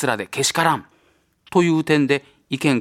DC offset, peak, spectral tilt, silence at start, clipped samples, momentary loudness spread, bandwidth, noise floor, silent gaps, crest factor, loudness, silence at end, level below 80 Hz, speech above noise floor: under 0.1%; -2 dBFS; -4.5 dB/octave; 0 s; under 0.1%; 6 LU; 16.5 kHz; -61 dBFS; none; 18 dB; -20 LUFS; 0 s; -62 dBFS; 42 dB